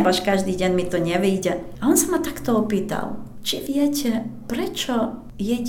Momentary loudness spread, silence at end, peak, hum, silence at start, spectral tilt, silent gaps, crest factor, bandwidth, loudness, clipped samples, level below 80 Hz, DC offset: 9 LU; 0 s; -4 dBFS; none; 0 s; -4.5 dB/octave; none; 18 dB; 18 kHz; -22 LUFS; under 0.1%; -46 dBFS; under 0.1%